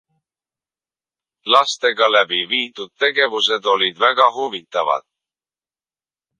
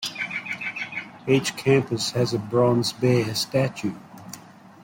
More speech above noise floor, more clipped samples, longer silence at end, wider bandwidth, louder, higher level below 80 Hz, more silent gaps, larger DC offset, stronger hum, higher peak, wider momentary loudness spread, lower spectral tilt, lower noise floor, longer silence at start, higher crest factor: first, over 73 dB vs 22 dB; neither; first, 1.4 s vs 0.35 s; second, 10.5 kHz vs 16.5 kHz; first, -17 LUFS vs -24 LUFS; second, -74 dBFS vs -60 dBFS; neither; neither; neither; first, 0 dBFS vs -6 dBFS; second, 9 LU vs 17 LU; second, -1 dB/octave vs -5 dB/octave; first, under -90 dBFS vs -44 dBFS; first, 1.45 s vs 0 s; about the same, 20 dB vs 18 dB